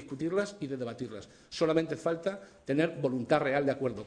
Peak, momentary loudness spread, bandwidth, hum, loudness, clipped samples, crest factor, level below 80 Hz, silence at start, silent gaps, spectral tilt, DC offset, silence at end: -12 dBFS; 13 LU; 10 kHz; none; -31 LUFS; under 0.1%; 20 dB; -66 dBFS; 0 s; none; -6 dB/octave; under 0.1%; 0 s